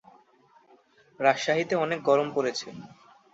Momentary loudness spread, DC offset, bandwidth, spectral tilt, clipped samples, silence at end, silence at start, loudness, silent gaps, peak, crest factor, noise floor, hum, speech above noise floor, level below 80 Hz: 13 LU; under 0.1%; 8 kHz; -4.5 dB/octave; under 0.1%; 0.45 s; 1.2 s; -26 LUFS; none; -6 dBFS; 22 dB; -61 dBFS; none; 35 dB; -72 dBFS